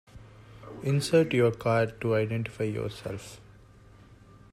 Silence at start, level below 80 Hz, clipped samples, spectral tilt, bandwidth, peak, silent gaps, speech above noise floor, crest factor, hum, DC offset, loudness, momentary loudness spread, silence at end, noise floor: 0.15 s; -58 dBFS; under 0.1%; -6.5 dB/octave; 14.5 kHz; -12 dBFS; none; 26 dB; 18 dB; none; under 0.1%; -28 LUFS; 17 LU; 1.15 s; -53 dBFS